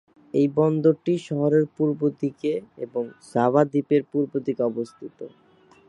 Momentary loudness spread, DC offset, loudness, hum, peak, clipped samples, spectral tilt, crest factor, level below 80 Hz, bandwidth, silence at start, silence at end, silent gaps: 12 LU; under 0.1%; -24 LUFS; none; -4 dBFS; under 0.1%; -8.5 dB/octave; 20 dB; -70 dBFS; 11 kHz; 0.35 s; 0.6 s; none